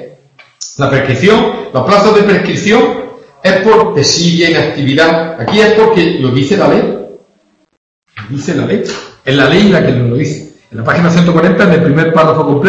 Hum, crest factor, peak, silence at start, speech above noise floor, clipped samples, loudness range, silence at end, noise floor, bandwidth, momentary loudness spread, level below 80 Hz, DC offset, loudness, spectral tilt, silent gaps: none; 10 dB; 0 dBFS; 0 s; 45 dB; 0.5%; 4 LU; 0 s; -53 dBFS; 8.4 kHz; 13 LU; -42 dBFS; under 0.1%; -9 LUFS; -5.5 dB/octave; 7.77-8.02 s